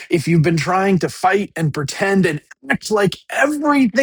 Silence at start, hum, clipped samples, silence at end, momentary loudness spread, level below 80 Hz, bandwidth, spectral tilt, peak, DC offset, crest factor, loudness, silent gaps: 0 s; none; under 0.1%; 0 s; 6 LU; -52 dBFS; 19.5 kHz; -6 dB/octave; 0 dBFS; under 0.1%; 16 dB; -17 LUFS; none